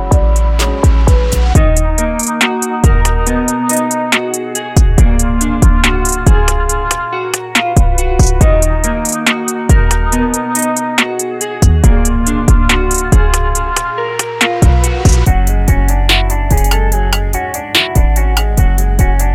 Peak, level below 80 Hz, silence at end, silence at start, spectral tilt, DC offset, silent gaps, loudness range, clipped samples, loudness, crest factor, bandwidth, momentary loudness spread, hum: 0 dBFS; -12 dBFS; 0 s; 0 s; -4.5 dB/octave; under 0.1%; none; 1 LU; under 0.1%; -13 LUFS; 10 dB; 16.5 kHz; 5 LU; none